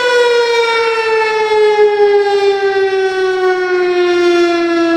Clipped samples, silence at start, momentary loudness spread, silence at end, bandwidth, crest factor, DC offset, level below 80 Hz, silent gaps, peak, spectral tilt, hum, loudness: under 0.1%; 0 s; 3 LU; 0 s; 10.5 kHz; 10 dB; under 0.1%; -58 dBFS; none; -2 dBFS; -3 dB/octave; none; -12 LUFS